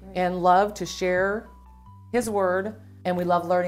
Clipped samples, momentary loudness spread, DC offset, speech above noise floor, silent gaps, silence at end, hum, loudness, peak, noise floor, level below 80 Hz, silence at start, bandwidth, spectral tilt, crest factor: under 0.1%; 10 LU; under 0.1%; 24 dB; none; 0 s; none; -24 LUFS; -6 dBFS; -47 dBFS; -52 dBFS; 0 s; 16 kHz; -5.5 dB/octave; 18 dB